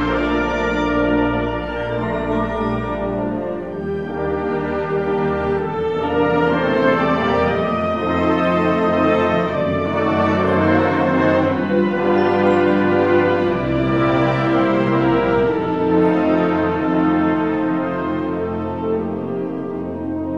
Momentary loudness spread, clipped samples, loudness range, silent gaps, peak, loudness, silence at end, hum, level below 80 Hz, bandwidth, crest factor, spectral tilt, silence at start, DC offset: 8 LU; under 0.1%; 5 LU; none; -4 dBFS; -18 LUFS; 0 s; none; -38 dBFS; 7.6 kHz; 14 dB; -8 dB/octave; 0 s; 0.4%